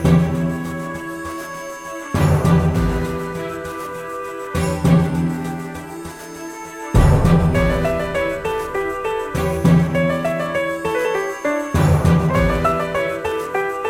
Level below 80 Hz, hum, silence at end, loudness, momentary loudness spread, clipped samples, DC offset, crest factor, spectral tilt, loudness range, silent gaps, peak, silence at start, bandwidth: -30 dBFS; none; 0 s; -19 LUFS; 14 LU; under 0.1%; under 0.1%; 16 dB; -7 dB/octave; 4 LU; none; -2 dBFS; 0 s; 16 kHz